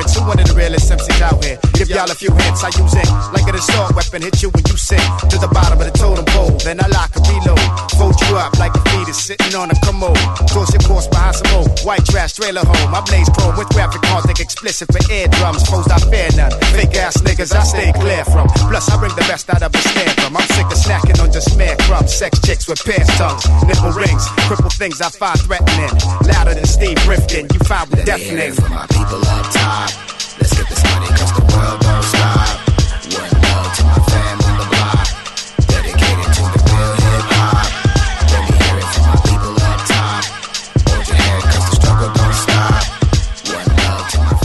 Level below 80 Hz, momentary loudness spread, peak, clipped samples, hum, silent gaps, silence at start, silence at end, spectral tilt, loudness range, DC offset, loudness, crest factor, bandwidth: -16 dBFS; 4 LU; 0 dBFS; under 0.1%; none; none; 0 s; 0 s; -4.5 dB/octave; 1 LU; under 0.1%; -13 LUFS; 12 dB; 12.5 kHz